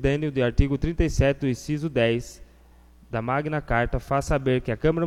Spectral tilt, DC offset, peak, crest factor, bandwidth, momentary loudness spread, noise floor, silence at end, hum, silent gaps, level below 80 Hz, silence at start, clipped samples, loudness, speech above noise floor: -6.5 dB/octave; under 0.1%; -6 dBFS; 18 dB; 14 kHz; 5 LU; -52 dBFS; 0 s; none; none; -32 dBFS; 0 s; under 0.1%; -25 LUFS; 29 dB